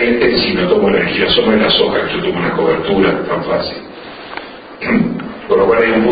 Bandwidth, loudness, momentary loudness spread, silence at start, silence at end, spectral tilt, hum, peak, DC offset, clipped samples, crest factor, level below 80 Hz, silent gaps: 5 kHz; -13 LUFS; 17 LU; 0 s; 0 s; -9.5 dB/octave; none; 0 dBFS; under 0.1%; under 0.1%; 14 dB; -40 dBFS; none